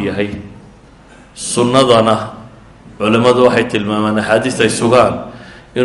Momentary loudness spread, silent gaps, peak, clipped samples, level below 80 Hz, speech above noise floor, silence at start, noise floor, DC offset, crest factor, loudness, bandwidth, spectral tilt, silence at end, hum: 15 LU; none; 0 dBFS; under 0.1%; -44 dBFS; 28 dB; 0 s; -41 dBFS; under 0.1%; 14 dB; -13 LUFS; 11.5 kHz; -5 dB/octave; 0 s; none